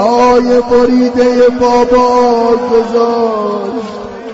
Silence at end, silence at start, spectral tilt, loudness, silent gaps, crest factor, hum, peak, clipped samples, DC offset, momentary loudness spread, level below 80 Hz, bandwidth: 0 s; 0 s; -5.5 dB/octave; -10 LUFS; none; 10 dB; none; 0 dBFS; under 0.1%; under 0.1%; 10 LU; -38 dBFS; 7.8 kHz